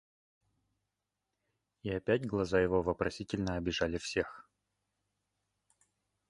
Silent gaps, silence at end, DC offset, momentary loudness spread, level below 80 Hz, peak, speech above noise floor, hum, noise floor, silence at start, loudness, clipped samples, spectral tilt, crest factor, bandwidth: none; 1.9 s; under 0.1%; 8 LU; -56 dBFS; -16 dBFS; 54 dB; 50 Hz at -60 dBFS; -87 dBFS; 1.85 s; -34 LUFS; under 0.1%; -5.5 dB/octave; 22 dB; 11.5 kHz